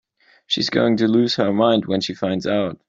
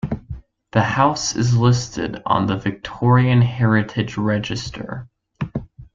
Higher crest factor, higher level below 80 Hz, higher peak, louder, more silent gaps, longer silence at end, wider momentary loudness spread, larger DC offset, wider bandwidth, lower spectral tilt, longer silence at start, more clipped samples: about the same, 16 dB vs 18 dB; second, -60 dBFS vs -44 dBFS; about the same, -4 dBFS vs -2 dBFS; about the same, -19 LUFS vs -19 LUFS; neither; about the same, 0.15 s vs 0.1 s; second, 6 LU vs 15 LU; neither; about the same, 7.8 kHz vs 7.6 kHz; about the same, -5.5 dB/octave vs -6 dB/octave; first, 0.5 s vs 0.05 s; neither